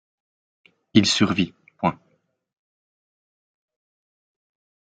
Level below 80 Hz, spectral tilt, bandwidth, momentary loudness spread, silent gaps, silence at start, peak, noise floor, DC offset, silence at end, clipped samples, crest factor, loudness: -62 dBFS; -4.5 dB/octave; 9.4 kHz; 8 LU; none; 0.95 s; -2 dBFS; -68 dBFS; under 0.1%; 2.85 s; under 0.1%; 26 dB; -21 LUFS